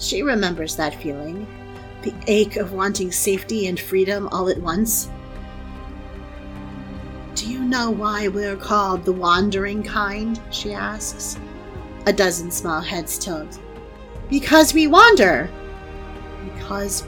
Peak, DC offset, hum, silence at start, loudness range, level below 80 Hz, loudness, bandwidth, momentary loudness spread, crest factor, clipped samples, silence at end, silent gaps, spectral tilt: 0 dBFS; under 0.1%; none; 0 s; 9 LU; -38 dBFS; -19 LUFS; 19 kHz; 21 LU; 20 dB; under 0.1%; 0 s; none; -3.5 dB/octave